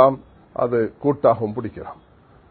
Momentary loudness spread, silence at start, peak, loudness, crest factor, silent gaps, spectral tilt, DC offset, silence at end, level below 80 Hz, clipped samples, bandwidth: 17 LU; 0 s; 0 dBFS; -21 LUFS; 20 dB; none; -12.5 dB/octave; under 0.1%; 0.55 s; -52 dBFS; under 0.1%; 4.5 kHz